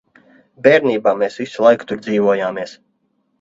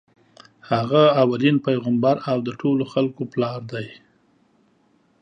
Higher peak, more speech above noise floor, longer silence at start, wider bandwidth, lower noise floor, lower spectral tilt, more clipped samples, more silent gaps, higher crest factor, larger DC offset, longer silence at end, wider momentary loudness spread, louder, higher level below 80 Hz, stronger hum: about the same, 0 dBFS vs -2 dBFS; first, 50 dB vs 41 dB; about the same, 0.65 s vs 0.7 s; about the same, 7.8 kHz vs 7.4 kHz; first, -66 dBFS vs -61 dBFS; second, -6 dB/octave vs -8 dB/octave; neither; neither; about the same, 18 dB vs 20 dB; neither; second, 0.65 s vs 1.3 s; second, 10 LU vs 13 LU; first, -16 LUFS vs -21 LUFS; first, -62 dBFS vs -68 dBFS; neither